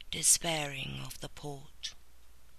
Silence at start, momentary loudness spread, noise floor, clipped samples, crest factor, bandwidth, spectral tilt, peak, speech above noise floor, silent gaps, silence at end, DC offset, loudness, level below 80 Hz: 0 s; 19 LU; -60 dBFS; under 0.1%; 24 dB; 14 kHz; -1.5 dB/octave; -12 dBFS; 26 dB; none; 0.3 s; 0.3%; -30 LUFS; -54 dBFS